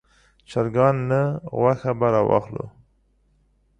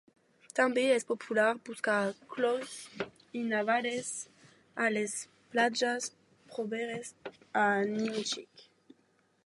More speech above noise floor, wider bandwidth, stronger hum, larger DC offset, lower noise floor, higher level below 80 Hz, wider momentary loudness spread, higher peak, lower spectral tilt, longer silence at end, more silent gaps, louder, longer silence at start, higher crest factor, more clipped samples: about the same, 42 dB vs 39 dB; second, 9.4 kHz vs 11.5 kHz; neither; neither; second, -63 dBFS vs -71 dBFS; first, -54 dBFS vs -82 dBFS; about the same, 13 LU vs 13 LU; first, -4 dBFS vs -12 dBFS; first, -9 dB/octave vs -3 dB/octave; first, 1.1 s vs 0.85 s; neither; first, -21 LUFS vs -32 LUFS; about the same, 0.5 s vs 0.55 s; about the same, 18 dB vs 22 dB; neither